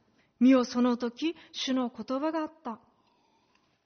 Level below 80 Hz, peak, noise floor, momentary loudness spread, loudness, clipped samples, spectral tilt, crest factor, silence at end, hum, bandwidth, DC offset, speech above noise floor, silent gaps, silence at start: -74 dBFS; -12 dBFS; -70 dBFS; 16 LU; -28 LUFS; under 0.1%; -3 dB/octave; 18 dB; 1.1 s; none; 6.6 kHz; under 0.1%; 42 dB; none; 0.4 s